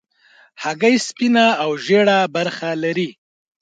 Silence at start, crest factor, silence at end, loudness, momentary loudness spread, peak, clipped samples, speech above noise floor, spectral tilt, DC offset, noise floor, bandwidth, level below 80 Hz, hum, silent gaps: 0.6 s; 16 dB; 0.5 s; -17 LUFS; 10 LU; -2 dBFS; under 0.1%; 36 dB; -4.5 dB/octave; under 0.1%; -53 dBFS; 9.2 kHz; -70 dBFS; none; none